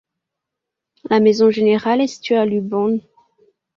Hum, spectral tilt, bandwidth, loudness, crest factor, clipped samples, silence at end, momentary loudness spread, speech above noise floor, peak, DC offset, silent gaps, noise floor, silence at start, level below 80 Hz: none; -6 dB/octave; 7.4 kHz; -17 LUFS; 16 dB; under 0.1%; 0.75 s; 6 LU; 66 dB; -2 dBFS; under 0.1%; none; -82 dBFS; 1.1 s; -64 dBFS